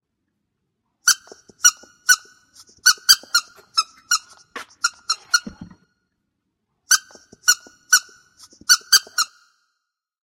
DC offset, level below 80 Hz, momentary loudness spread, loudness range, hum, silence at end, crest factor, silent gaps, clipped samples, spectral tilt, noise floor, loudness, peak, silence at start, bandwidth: under 0.1%; -66 dBFS; 11 LU; 6 LU; none; 1.05 s; 22 dB; none; under 0.1%; 3.5 dB/octave; -79 dBFS; -18 LUFS; 0 dBFS; 1.05 s; 16.5 kHz